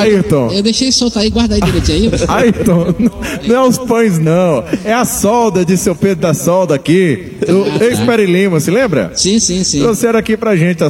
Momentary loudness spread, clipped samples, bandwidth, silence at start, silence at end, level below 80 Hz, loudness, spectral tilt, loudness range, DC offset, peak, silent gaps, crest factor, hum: 3 LU; under 0.1%; 16.5 kHz; 0 s; 0 s; -30 dBFS; -11 LUFS; -5 dB/octave; 1 LU; under 0.1%; 0 dBFS; none; 10 dB; none